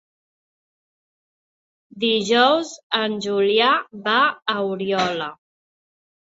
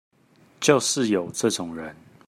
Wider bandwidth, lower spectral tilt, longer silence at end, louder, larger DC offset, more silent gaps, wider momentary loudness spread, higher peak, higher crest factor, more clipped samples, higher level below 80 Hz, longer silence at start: second, 8 kHz vs 16 kHz; about the same, -3.5 dB/octave vs -3.5 dB/octave; first, 1.05 s vs 0.35 s; first, -20 LUFS vs -23 LUFS; neither; first, 2.83-2.90 s vs none; second, 8 LU vs 15 LU; about the same, -2 dBFS vs -4 dBFS; about the same, 20 dB vs 22 dB; neither; about the same, -68 dBFS vs -68 dBFS; first, 1.95 s vs 0.6 s